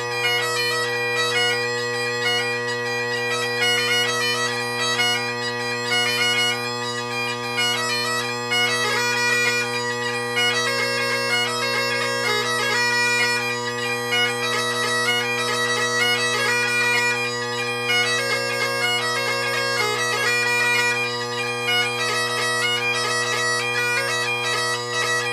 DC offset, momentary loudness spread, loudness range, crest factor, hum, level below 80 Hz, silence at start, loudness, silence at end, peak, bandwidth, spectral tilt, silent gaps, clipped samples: under 0.1%; 6 LU; 1 LU; 14 dB; none; -66 dBFS; 0 s; -20 LUFS; 0 s; -8 dBFS; 16 kHz; -1.5 dB/octave; none; under 0.1%